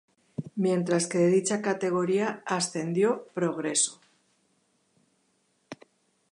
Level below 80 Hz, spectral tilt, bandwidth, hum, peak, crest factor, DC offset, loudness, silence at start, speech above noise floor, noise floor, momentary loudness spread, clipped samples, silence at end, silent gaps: -76 dBFS; -4.5 dB/octave; 11 kHz; none; -12 dBFS; 18 dB; under 0.1%; -27 LUFS; 0.4 s; 45 dB; -71 dBFS; 17 LU; under 0.1%; 0.6 s; none